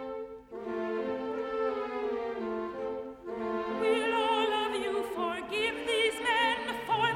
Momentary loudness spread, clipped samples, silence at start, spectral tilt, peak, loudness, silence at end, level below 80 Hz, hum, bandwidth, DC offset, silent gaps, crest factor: 10 LU; under 0.1%; 0 s; -3.5 dB/octave; -14 dBFS; -31 LUFS; 0 s; -64 dBFS; none; 15.5 kHz; under 0.1%; none; 18 dB